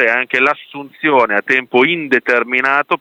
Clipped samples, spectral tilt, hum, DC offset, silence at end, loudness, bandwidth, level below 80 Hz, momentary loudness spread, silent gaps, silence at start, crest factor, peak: under 0.1%; -5 dB/octave; none; under 0.1%; 0.05 s; -14 LUFS; 9.2 kHz; -66 dBFS; 4 LU; none; 0 s; 14 dB; 0 dBFS